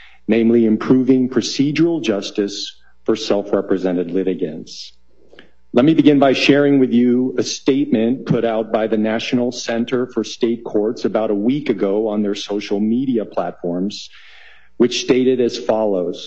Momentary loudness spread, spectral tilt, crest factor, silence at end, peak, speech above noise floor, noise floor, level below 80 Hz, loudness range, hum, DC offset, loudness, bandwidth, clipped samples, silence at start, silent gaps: 10 LU; -5.5 dB/octave; 16 dB; 0 s; 0 dBFS; 32 dB; -48 dBFS; -58 dBFS; 6 LU; none; 0.7%; -17 LUFS; 8 kHz; under 0.1%; 0.3 s; none